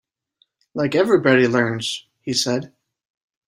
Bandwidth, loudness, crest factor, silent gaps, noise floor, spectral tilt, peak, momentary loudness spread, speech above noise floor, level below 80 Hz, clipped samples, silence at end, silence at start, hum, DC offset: 14 kHz; -19 LUFS; 20 dB; none; -65 dBFS; -4.5 dB/octave; -2 dBFS; 11 LU; 47 dB; -62 dBFS; under 0.1%; 0.85 s; 0.75 s; none; under 0.1%